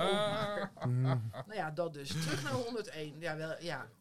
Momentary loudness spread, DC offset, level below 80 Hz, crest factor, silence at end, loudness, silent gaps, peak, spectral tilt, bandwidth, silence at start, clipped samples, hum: 8 LU; under 0.1%; -68 dBFS; 16 dB; 0 s; -37 LUFS; none; -20 dBFS; -5.5 dB/octave; 14.5 kHz; 0 s; under 0.1%; none